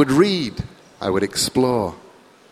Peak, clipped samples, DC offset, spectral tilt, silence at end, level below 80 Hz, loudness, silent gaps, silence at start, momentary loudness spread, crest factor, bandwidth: -2 dBFS; under 0.1%; under 0.1%; -4.5 dB/octave; 0.55 s; -46 dBFS; -20 LUFS; none; 0 s; 13 LU; 18 dB; 15.5 kHz